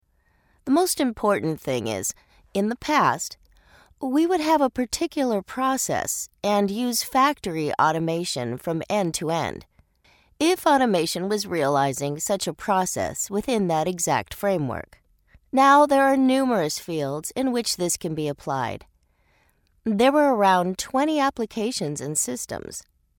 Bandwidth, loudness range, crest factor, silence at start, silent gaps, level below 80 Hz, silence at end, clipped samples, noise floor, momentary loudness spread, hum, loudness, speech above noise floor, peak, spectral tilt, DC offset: 18 kHz; 4 LU; 20 dB; 0.65 s; none; -56 dBFS; 0.4 s; under 0.1%; -64 dBFS; 9 LU; none; -23 LUFS; 42 dB; -4 dBFS; -4 dB/octave; under 0.1%